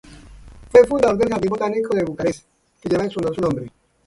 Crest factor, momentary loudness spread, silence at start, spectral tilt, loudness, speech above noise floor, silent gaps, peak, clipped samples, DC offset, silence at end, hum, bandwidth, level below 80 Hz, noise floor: 20 dB; 14 LU; 0.1 s; -6.5 dB/octave; -19 LUFS; 22 dB; none; 0 dBFS; under 0.1%; under 0.1%; 0.4 s; none; 11.5 kHz; -46 dBFS; -42 dBFS